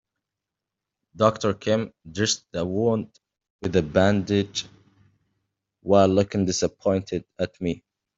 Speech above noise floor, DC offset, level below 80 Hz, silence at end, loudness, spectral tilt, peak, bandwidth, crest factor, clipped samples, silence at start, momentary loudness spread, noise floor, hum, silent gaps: 63 dB; under 0.1%; -56 dBFS; 0.4 s; -24 LUFS; -5 dB/octave; -4 dBFS; 8 kHz; 22 dB; under 0.1%; 1.15 s; 12 LU; -86 dBFS; none; 3.50-3.59 s